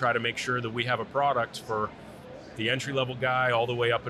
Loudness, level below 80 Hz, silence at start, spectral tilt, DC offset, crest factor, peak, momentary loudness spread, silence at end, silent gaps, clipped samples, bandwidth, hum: -28 LUFS; -62 dBFS; 0 s; -4.5 dB/octave; under 0.1%; 16 dB; -12 dBFS; 13 LU; 0 s; none; under 0.1%; 13.5 kHz; none